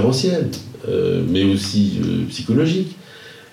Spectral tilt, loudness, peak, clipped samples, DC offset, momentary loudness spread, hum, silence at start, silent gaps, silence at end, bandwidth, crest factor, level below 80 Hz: -6 dB/octave; -19 LUFS; -6 dBFS; under 0.1%; under 0.1%; 12 LU; none; 0 s; none; 0.1 s; 14.5 kHz; 14 dB; -56 dBFS